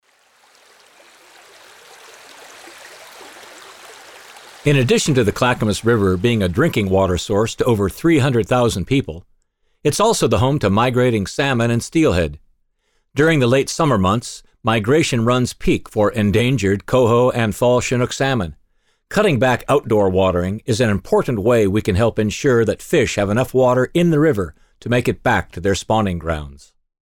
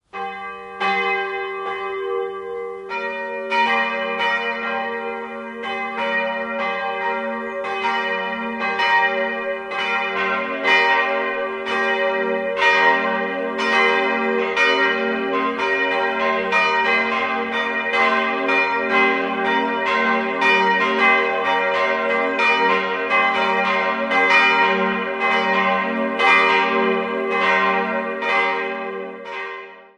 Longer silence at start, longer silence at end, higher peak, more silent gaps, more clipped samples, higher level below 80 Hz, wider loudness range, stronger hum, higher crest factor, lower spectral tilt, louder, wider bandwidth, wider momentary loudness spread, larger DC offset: first, 2.4 s vs 0.15 s; first, 0.5 s vs 0.15 s; about the same, -4 dBFS vs -2 dBFS; neither; neither; first, -40 dBFS vs -62 dBFS; second, 2 LU vs 6 LU; neither; about the same, 14 dB vs 18 dB; first, -5.5 dB/octave vs -4 dB/octave; about the same, -17 LUFS vs -19 LUFS; first, 17.5 kHz vs 10.5 kHz; about the same, 10 LU vs 11 LU; neither